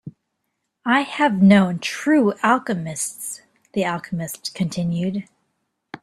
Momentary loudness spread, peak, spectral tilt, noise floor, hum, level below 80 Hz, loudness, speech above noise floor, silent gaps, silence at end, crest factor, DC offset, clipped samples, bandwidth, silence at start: 15 LU; -2 dBFS; -5.5 dB/octave; -76 dBFS; none; -60 dBFS; -20 LUFS; 56 dB; none; 0.05 s; 20 dB; under 0.1%; under 0.1%; 14 kHz; 0.05 s